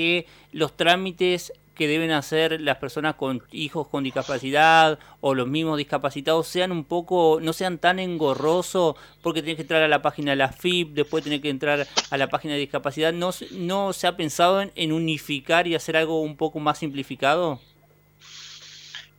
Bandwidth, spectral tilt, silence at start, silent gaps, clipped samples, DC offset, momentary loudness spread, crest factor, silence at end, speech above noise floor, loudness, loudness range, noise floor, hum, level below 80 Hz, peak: 18 kHz; -4.5 dB/octave; 0 s; none; under 0.1%; under 0.1%; 9 LU; 20 dB; 0.15 s; 34 dB; -23 LUFS; 3 LU; -57 dBFS; 50 Hz at -55 dBFS; -60 dBFS; -4 dBFS